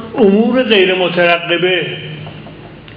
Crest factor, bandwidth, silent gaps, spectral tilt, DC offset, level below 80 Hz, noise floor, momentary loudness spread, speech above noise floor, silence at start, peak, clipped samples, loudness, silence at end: 14 dB; 5.2 kHz; none; -8.5 dB/octave; under 0.1%; -50 dBFS; -33 dBFS; 20 LU; 21 dB; 0 s; 0 dBFS; under 0.1%; -12 LUFS; 0 s